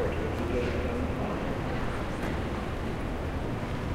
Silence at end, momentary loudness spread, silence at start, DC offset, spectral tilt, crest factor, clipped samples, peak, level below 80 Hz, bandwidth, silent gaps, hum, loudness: 0 s; 4 LU; 0 s; under 0.1%; -7 dB/octave; 12 dB; under 0.1%; -18 dBFS; -38 dBFS; 16 kHz; none; none; -32 LUFS